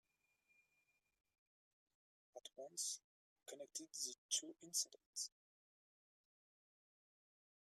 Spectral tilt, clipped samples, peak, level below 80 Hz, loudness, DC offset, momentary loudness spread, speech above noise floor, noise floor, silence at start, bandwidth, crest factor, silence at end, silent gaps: 1 dB/octave; under 0.1%; -28 dBFS; under -90 dBFS; -46 LUFS; under 0.1%; 16 LU; 36 dB; -85 dBFS; 2.35 s; 15 kHz; 26 dB; 2.4 s; 3.04-3.36 s, 4.18-4.29 s, 5.06-5.13 s